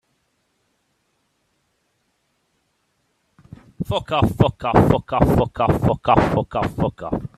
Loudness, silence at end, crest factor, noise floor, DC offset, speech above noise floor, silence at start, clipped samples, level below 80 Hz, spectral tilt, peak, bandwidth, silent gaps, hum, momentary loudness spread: -19 LUFS; 0.1 s; 22 dB; -69 dBFS; under 0.1%; 51 dB; 3.8 s; under 0.1%; -38 dBFS; -8 dB/octave; 0 dBFS; 14.5 kHz; none; none; 9 LU